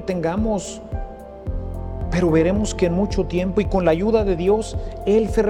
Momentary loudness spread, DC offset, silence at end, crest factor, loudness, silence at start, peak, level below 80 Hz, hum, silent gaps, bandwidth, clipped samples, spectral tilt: 13 LU; under 0.1%; 0 s; 16 dB; -21 LUFS; 0 s; -4 dBFS; -30 dBFS; none; none; 12.5 kHz; under 0.1%; -6.5 dB/octave